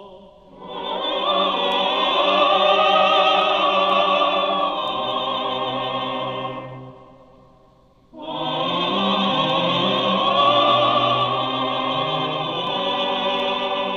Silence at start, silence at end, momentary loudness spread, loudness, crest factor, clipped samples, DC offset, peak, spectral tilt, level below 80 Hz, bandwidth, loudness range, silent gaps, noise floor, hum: 0 s; 0 s; 10 LU; -19 LUFS; 16 dB; under 0.1%; under 0.1%; -4 dBFS; -5 dB/octave; -58 dBFS; 7.4 kHz; 10 LU; none; -54 dBFS; none